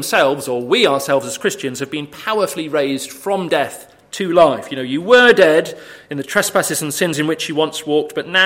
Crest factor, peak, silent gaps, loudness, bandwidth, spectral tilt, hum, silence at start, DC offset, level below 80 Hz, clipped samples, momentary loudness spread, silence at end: 16 dB; 0 dBFS; none; -16 LUFS; 16.5 kHz; -3.5 dB/octave; none; 0 s; under 0.1%; -60 dBFS; under 0.1%; 13 LU; 0 s